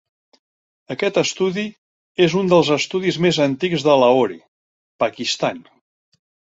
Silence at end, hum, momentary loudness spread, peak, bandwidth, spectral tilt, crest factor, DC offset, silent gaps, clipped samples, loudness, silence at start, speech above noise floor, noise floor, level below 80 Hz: 0.95 s; none; 14 LU; -2 dBFS; 8 kHz; -5 dB/octave; 18 dB; under 0.1%; 1.78-2.15 s, 4.48-4.99 s; under 0.1%; -18 LUFS; 0.9 s; over 72 dB; under -90 dBFS; -60 dBFS